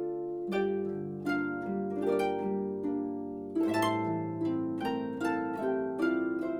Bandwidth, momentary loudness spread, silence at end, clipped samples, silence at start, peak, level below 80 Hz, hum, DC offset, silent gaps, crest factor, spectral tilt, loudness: 17 kHz; 6 LU; 0 s; under 0.1%; 0 s; -18 dBFS; -68 dBFS; none; under 0.1%; none; 14 dB; -7 dB/octave; -32 LUFS